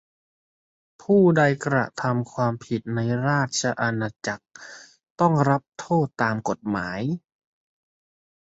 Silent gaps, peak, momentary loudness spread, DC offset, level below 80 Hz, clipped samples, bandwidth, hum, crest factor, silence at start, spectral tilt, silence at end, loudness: 5.10-5.16 s; -6 dBFS; 13 LU; under 0.1%; -60 dBFS; under 0.1%; 8 kHz; none; 18 dB; 1.1 s; -6 dB/octave; 1.25 s; -23 LUFS